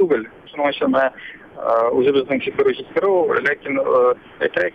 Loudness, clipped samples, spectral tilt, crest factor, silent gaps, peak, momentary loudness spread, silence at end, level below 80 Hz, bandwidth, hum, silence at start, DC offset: -19 LUFS; under 0.1%; -7 dB/octave; 14 dB; none; -4 dBFS; 6 LU; 0.05 s; -58 dBFS; 5.8 kHz; none; 0 s; under 0.1%